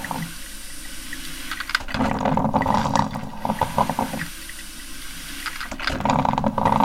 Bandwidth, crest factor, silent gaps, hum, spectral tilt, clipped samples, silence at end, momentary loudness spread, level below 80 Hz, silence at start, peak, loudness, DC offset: 17 kHz; 20 dB; none; none; -5 dB/octave; under 0.1%; 0 s; 14 LU; -38 dBFS; 0 s; -4 dBFS; -24 LUFS; under 0.1%